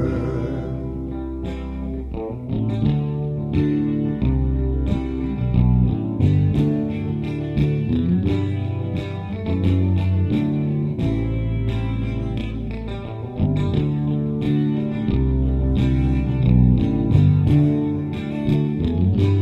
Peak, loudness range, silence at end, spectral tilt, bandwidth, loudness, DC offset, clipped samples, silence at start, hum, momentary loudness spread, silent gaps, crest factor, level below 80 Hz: -4 dBFS; 5 LU; 0 s; -10 dB/octave; 5.6 kHz; -21 LUFS; under 0.1%; under 0.1%; 0 s; none; 11 LU; none; 16 dB; -28 dBFS